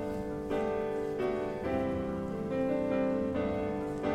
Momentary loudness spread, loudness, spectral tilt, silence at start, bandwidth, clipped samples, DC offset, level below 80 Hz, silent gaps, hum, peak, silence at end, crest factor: 4 LU; -33 LUFS; -8 dB/octave; 0 s; 14 kHz; under 0.1%; under 0.1%; -52 dBFS; none; none; -20 dBFS; 0 s; 12 dB